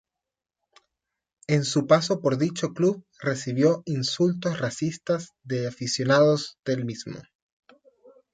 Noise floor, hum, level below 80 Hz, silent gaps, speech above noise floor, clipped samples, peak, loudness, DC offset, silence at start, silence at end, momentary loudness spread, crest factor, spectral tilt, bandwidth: -88 dBFS; none; -68 dBFS; 6.59-6.63 s; 64 dB; under 0.1%; -6 dBFS; -25 LUFS; under 0.1%; 1.5 s; 1.1 s; 10 LU; 20 dB; -5.5 dB/octave; 9.4 kHz